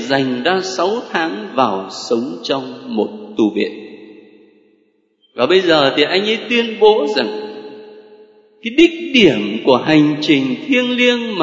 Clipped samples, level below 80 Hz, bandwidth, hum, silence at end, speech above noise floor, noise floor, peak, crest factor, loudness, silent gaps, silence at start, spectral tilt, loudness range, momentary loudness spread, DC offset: under 0.1%; -56 dBFS; 8 kHz; none; 0 s; 44 dB; -59 dBFS; 0 dBFS; 16 dB; -15 LUFS; none; 0 s; -5 dB/octave; 7 LU; 12 LU; under 0.1%